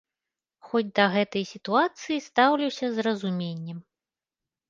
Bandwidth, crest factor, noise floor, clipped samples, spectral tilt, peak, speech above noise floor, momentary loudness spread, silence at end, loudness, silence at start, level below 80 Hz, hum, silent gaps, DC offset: 7.6 kHz; 22 dB; under -90 dBFS; under 0.1%; -5.5 dB/octave; -4 dBFS; over 65 dB; 11 LU; 0.9 s; -26 LUFS; 0.65 s; -74 dBFS; none; none; under 0.1%